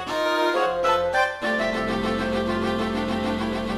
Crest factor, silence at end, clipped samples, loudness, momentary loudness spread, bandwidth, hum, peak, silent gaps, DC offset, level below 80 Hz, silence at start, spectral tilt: 14 dB; 0 s; under 0.1%; -23 LUFS; 4 LU; 14.5 kHz; none; -8 dBFS; none; under 0.1%; -44 dBFS; 0 s; -5 dB/octave